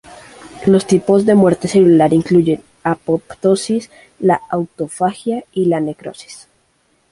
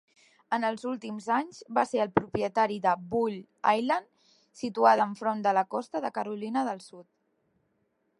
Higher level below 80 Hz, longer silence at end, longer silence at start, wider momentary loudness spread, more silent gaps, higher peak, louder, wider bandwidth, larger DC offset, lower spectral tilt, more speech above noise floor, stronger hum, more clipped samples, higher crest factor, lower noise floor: first, -52 dBFS vs -66 dBFS; second, 0.75 s vs 1.15 s; second, 0.1 s vs 0.5 s; first, 12 LU vs 9 LU; neither; first, -2 dBFS vs -6 dBFS; first, -15 LUFS vs -29 LUFS; about the same, 11.5 kHz vs 11.5 kHz; neither; about the same, -6.5 dB/octave vs -5.5 dB/octave; about the same, 45 dB vs 46 dB; neither; neither; second, 14 dB vs 24 dB; second, -60 dBFS vs -74 dBFS